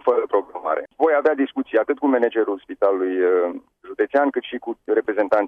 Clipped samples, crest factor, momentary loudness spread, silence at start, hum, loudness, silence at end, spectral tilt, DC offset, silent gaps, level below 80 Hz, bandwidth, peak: under 0.1%; 14 dB; 8 LU; 0.05 s; none; -21 LUFS; 0 s; -6.5 dB/octave; under 0.1%; none; -68 dBFS; 4.9 kHz; -6 dBFS